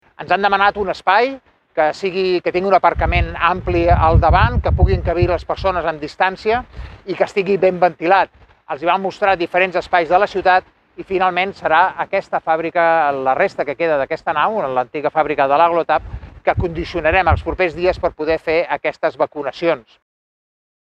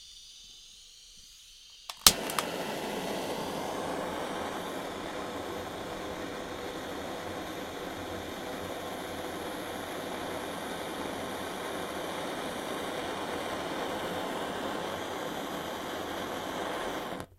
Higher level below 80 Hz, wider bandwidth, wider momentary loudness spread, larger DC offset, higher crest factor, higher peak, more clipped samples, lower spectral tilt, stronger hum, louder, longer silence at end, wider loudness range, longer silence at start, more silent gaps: first, -28 dBFS vs -58 dBFS; second, 8.4 kHz vs 16 kHz; about the same, 7 LU vs 5 LU; neither; second, 16 dB vs 36 dB; about the same, 0 dBFS vs 0 dBFS; neither; first, -7 dB/octave vs -2.5 dB/octave; neither; first, -17 LUFS vs -34 LUFS; first, 1.05 s vs 0.05 s; second, 3 LU vs 8 LU; first, 0.2 s vs 0 s; neither